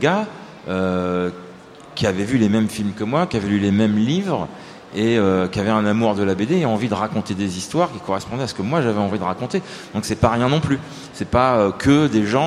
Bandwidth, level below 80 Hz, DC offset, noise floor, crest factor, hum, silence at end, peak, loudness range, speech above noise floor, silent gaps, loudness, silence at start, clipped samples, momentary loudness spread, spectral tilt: 13.5 kHz; -46 dBFS; under 0.1%; -40 dBFS; 18 dB; none; 0 s; 0 dBFS; 3 LU; 21 dB; none; -20 LUFS; 0 s; under 0.1%; 10 LU; -6.5 dB/octave